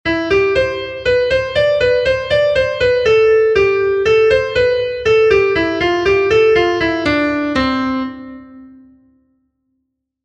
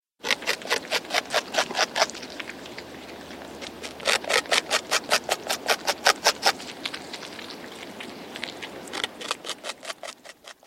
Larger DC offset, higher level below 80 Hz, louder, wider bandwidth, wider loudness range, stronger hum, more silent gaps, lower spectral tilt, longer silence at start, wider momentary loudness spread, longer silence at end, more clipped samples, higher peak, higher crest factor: neither; first, -38 dBFS vs -64 dBFS; first, -14 LUFS vs -26 LUFS; second, 8.4 kHz vs 16.5 kHz; second, 5 LU vs 11 LU; neither; neither; first, -5.5 dB/octave vs 0 dB/octave; second, 0.05 s vs 0.2 s; second, 5 LU vs 17 LU; first, 1.55 s vs 0.15 s; neither; about the same, 0 dBFS vs -2 dBFS; second, 14 dB vs 28 dB